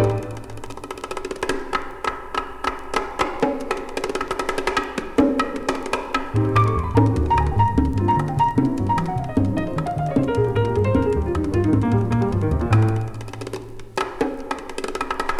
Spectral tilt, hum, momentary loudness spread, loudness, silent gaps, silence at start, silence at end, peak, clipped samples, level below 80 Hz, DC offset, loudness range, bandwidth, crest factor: -7 dB/octave; none; 11 LU; -22 LUFS; none; 0 s; 0 s; -4 dBFS; under 0.1%; -34 dBFS; under 0.1%; 6 LU; 12.5 kHz; 18 dB